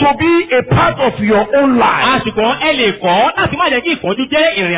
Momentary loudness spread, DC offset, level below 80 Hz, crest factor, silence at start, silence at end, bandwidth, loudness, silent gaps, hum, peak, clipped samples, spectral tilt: 4 LU; under 0.1%; -38 dBFS; 12 dB; 0 s; 0 s; 4 kHz; -12 LUFS; none; none; -2 dBFS; under 0.1%; -9 dB/octave